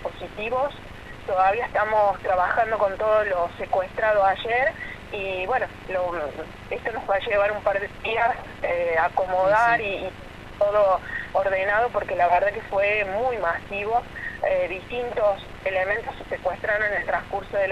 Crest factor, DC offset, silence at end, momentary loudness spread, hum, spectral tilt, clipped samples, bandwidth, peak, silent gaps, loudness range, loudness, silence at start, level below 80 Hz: 16 dB; under 0.1%; 0 s; 10 LU; none; -5.5 dB/octave; under 0.1%; 12.5 kHz; -8 dBFS; none; 3 LU; -24 LUFS; 0 s; -46 dBFS